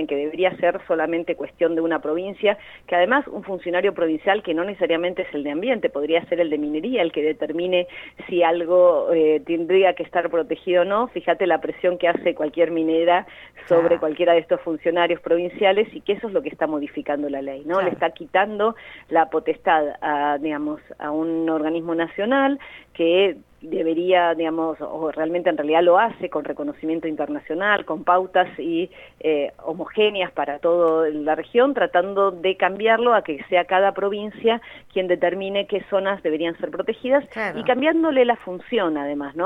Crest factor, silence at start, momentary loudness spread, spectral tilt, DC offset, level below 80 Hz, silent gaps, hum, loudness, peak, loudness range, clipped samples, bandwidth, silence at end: 18 dB; 0 s; 9 LU; -7 dB/octave; under 0.1%; -60 dBFS; none; none; -21 LUFS; -4 dBFS; 3 LU; under 0.1%; 4 kHz; 0 s